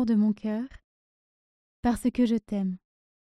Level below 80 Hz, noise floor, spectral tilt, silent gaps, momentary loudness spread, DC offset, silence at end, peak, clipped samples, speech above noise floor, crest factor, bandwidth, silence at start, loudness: -52 dBFS; under -90 dBFS; -7 dB/octave; 0.84-1.83 s; 10 LU; under 0.1%; 0.45 s; -12 dBFS; under 0.1%; over 64 dB; 16 dB; 13.5 kHz; 0 s; -28 LUFS